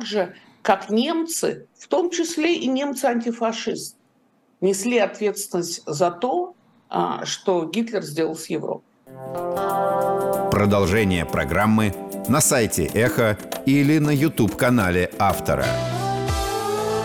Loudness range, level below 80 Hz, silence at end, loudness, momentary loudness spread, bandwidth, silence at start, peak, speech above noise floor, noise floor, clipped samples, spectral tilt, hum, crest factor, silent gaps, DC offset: 5 LU; -44 dBFS; 0 s; -22 LUFS; 9 LU; over 20 kHz; 0 s; -6 dBFS; 40 dB; -61 dBFS; under 0.1%; -5 dB/octave; none; 16 dB; none; under 0.1%